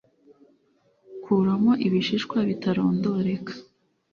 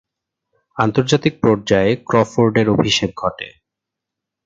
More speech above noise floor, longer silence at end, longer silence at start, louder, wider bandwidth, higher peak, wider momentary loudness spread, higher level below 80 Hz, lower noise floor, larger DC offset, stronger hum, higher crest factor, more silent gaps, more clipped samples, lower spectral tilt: second, 42 dB vs 67 dB; second, 0.5 s vs 0.95 s; first, 1.1 s vs 0.75 s; second, -24 LUFS vs -16 LUFS; second, 7 kHz vs 9 kHz; second, -10 dBFS vs 0 dBFS; first, 19 LU vs 9 LU; second, -64 dBFS vs -46 dBFS; second, -65 dBFS vs -83 dBFS; neither; neither; about the same, 16 dB vs 18 dB; neither; neither; first, -7.5 dB/octave vs -5.5 dB/octave